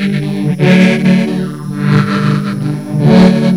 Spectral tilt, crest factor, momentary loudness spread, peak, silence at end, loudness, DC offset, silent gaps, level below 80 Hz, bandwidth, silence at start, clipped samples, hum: -7.5 dB/octave; 10 dB; 10 LU; 0 dBFS; 0 s; -11 LUFS; 0.5%; none; -40 dBFS; 11 kHz; 0 s; 0.7%; none